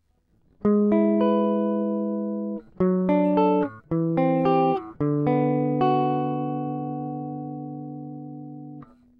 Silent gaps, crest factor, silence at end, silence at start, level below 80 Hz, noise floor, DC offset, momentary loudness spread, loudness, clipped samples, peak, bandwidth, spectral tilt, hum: none; 16 dB; 0.35 s; 0.6 s; -60 dBFS; -64 dBFS; under 0.1%; 16 LU; -24 LUFS; under 0.1%; -8 dBFS; 5 kHz; -11 dB/octave; none